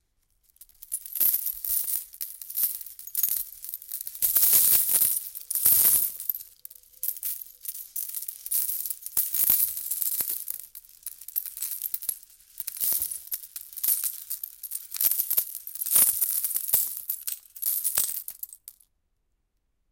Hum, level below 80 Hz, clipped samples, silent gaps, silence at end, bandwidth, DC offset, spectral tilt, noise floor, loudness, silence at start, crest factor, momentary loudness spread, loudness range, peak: none; -66 dBFS; under 0.1%; none; 1.2 s; 17.5 kHz; under 0.1%; 1.5 dB/octave; -74 dBFS; -24 LUFS; 0.8 s; 22 dB; 17 LU; 9 LU; -6 dBFS